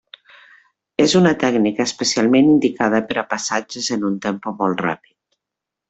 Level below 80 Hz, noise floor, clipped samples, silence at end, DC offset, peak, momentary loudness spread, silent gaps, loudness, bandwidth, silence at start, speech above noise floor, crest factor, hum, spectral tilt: -58 dBFS; -84 dBFS; under 0.1%; 0.95 s; under 0.1%; -4 dBFS; 9 LU; none; -18 LUFS; 8.2 kHz; 1 s; 67 dB; 16 dB; none; -4.5 dB/octave